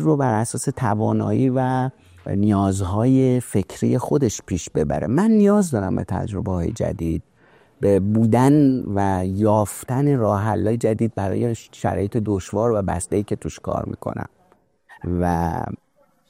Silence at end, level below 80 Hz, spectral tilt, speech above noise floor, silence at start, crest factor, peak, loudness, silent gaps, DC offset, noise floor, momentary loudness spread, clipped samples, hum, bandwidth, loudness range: 0.55 s; -44 dBFS; -7.5 dB/octave; 40 dB; 0 s; 16 dB; -4 dBFS; -21 LUFS; none; under 0.1%; -59 dBFS; 10 LU; under 0.1%; none; 16 kHz; 6 LU